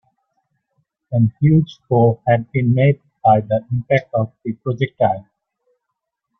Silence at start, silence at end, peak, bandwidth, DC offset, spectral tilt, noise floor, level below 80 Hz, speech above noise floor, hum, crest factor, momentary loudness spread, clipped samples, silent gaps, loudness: 1.1 s; 1.2 s; -2 dBFS; 6 kHz; under 0.1%; -10 dB/octave; -78 dBFS; -52 dBFS; 61 dB; none; 16 dB; 8 LU; under 0.1%; none; -18 LUFS